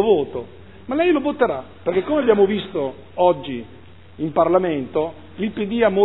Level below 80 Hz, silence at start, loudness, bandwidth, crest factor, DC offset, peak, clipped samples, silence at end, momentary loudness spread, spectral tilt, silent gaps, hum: -54 dBFS; 0 s; -20 LUFS; 4.1 kHz; 18 dB; 0.5%; -2 dBFS; under 0.1%; 0 s; 12 LU; -10.5 dB/octave; none; none